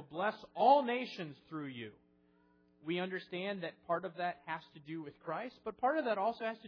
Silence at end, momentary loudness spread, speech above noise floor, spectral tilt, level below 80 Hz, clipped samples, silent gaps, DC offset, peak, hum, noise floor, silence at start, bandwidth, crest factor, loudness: 0 s; 16 LU; 33 dB; -3 dB/octave; -80 dBFS; under 0.1%; none; under 0.1%; -16 dBFS; none; -70 dBFS; 0 s; 5.4 kHz; 22 dB; -37 LUFS